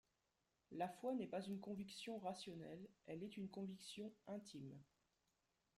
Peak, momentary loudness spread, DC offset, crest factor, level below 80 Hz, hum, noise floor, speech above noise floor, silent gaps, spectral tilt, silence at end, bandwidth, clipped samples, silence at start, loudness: -34 dBFS; 10 LU; under 0.1%; 18 dB; -86 dBFS; none; -88 dBFS; 37 dB; none; -5.5 dB/octave; 0.95 s; 15.5 kHz; under 0.1%; 0.7 s; -52 LUFS